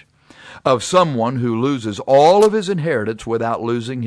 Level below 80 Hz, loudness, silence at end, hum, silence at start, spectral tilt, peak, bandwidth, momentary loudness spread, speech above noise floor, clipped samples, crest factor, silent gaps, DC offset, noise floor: -56 dBFS; -17 LUFS; 0 s; none; 0.45 s; -5.5 dB/octave; -2 dBFS; 11 kHz; 10 LU; 28 dB; under 0.1%; 16 dB; none; under 0.1%; -44 dBFS